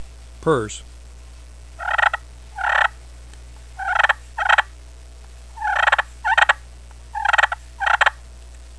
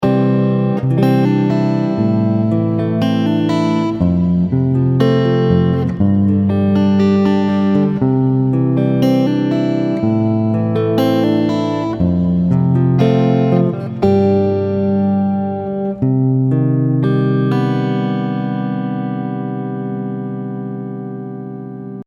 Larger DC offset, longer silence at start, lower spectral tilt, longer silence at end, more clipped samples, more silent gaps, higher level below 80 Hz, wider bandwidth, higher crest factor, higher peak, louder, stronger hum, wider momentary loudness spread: first, 0.3% vs under 0.1%; about the same, 0 s vs 0 s; second, -3 dB/octave vs -9.5 dB/octave; about the same, 0 s vs 0.05 s; neither; neither; about the same, -40 dBFS vs -44 dBFS; first, 11 kHz vs 7.2 kHz; first, 22 dB vs 14 dB; about the same, 0 dBFS vs 0 dBFS; second, -19 LUFS vs -15 LUFS; neither; first, 14 LU vs 9 LU